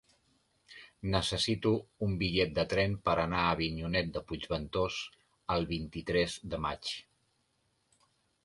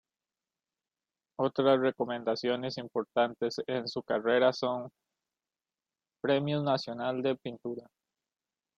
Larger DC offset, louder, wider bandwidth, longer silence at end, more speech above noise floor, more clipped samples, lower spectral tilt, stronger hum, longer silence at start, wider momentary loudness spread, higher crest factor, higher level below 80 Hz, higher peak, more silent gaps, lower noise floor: neither; about the same, -33 LUFS vs -31 LUFS; first, 11.5 kHz vs 7.6 kHz; first, 1.45 s vs 0.95 s; second, 44 dB vs over 60 dB; neither; about the same, -5 dB/octave vs -6 dB/octave; neither; second, 0.7 s vs 1.4 s; about the same, 10 LU vs 12 LU; about the same, 20 dB vs 20 dB; first, -50 dBFS vs -76 dBFS; about the same, -14 dBFS vs -14 dBFS; neither; second, -76 dBFS vs under -90 dBFS